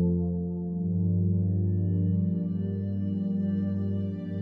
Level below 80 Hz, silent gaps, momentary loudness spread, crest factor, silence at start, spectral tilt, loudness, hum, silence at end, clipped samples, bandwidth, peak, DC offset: -54 dBFS; none; 5 LU; 10 dB; 0 s; -13 dB/octave; -28 LUFS; none; 0 s; under 0.1%; 3.1 kHz; -16 dBFS; under 0.1%